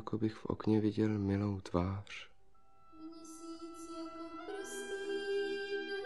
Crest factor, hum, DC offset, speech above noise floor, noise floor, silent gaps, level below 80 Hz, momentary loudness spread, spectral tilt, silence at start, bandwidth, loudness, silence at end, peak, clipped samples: 20 dB; 50 Hz at -60 dBFS; 0.1%; 34 dB; -69 dBFS; none; -64 dBFS; 17 LU; -6.5 dB/octave; 0 s; 12.5 kHz; -38 LUFS; 0 s; -18 dBFS; under 0.1%